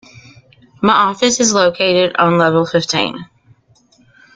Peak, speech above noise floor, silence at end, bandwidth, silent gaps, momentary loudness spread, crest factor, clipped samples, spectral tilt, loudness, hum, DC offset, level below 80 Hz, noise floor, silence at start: 0 dBFS; 39 dB; 1.1 s; 9.6 kHz; none; 6 LU; 14 dB; under 0.1%; -3.5 dB/octave; -13 LUFS; none; under 0.1%; -54 dBFS; -53 dBFS; 0.8 s